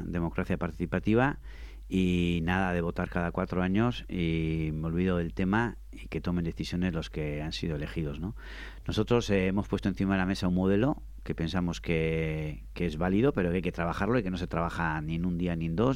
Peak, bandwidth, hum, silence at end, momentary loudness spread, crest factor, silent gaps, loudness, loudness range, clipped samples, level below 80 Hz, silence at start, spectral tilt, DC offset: -12 dBFS; 12 kHz; none; 0 s; 9 LU; 18 dB; none; -30 LUFS; 3 LU; under 0.1%; -44 dBFS; 0 s; -7 dB/octave; under 0.1%